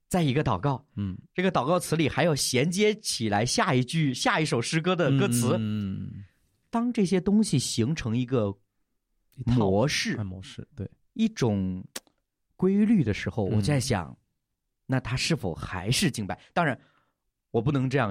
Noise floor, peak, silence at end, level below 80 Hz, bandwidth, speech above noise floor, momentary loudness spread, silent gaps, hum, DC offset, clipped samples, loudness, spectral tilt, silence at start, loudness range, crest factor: -80 dBFS; -10 dBFS; 0 s; -52 dBFS; 16 kHz; 54 dB; 12 LU; none; none; under 0.1%; under 0.1%; -26 LUFS; -5 dB/octave; 0.1 s; 4 LU; 16 dB